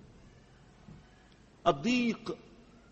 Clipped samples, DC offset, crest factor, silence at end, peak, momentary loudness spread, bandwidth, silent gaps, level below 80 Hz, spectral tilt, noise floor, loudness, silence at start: under 0.1%; under 0.1%; 24 dB; 0.55 s; -12 dBFS; 26 LU; 8.2 kHz; none; -62 dBFS; -5 dB/octave; -59 dBFS; -32 LUFS; 0.9 s